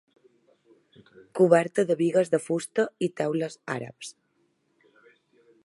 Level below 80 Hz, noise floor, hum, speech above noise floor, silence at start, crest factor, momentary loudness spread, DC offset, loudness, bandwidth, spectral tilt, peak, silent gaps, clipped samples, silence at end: -78 dBFS; -71 dBFS; none; 46 dB; 1.35 s; 22 dB; 18 LU; under 0.1%; -25 LUFS; 11.5 kHz; -6 dB/octave; -6 dBFS; none; under 0.1%; 1.55 s